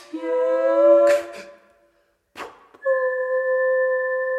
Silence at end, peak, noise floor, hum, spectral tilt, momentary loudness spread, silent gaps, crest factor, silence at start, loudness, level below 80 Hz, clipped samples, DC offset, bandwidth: 0 s; -6 dBFS; -64 dBFS; none; -3.5 dB/octave; 23 LU; none; 16 dB; 0.15 s; -20 LUFS; -74 dBFS; under 0.1%; under 0.1%; 12 kHz